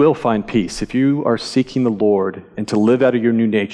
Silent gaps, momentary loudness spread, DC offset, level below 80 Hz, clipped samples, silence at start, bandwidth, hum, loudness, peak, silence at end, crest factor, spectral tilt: none; 7 LU; under 0.1%; -46 dBFS; under 0.1%; 0 s; 11 kHz; none; -17 LUFS; -4 dBFS; 0 s; 12 dB; -6.5 dB/octave